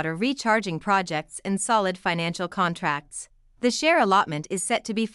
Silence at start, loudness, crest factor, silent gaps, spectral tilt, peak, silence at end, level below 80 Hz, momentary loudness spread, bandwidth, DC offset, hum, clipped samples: 0 s; -24 LUFS; 18 dB; none; -4 dB/octave; -8 dBFS; 0.05 s; -60 dBFS; 10 LU; 13.5 kHz; under 0.1%; none; under 0.1%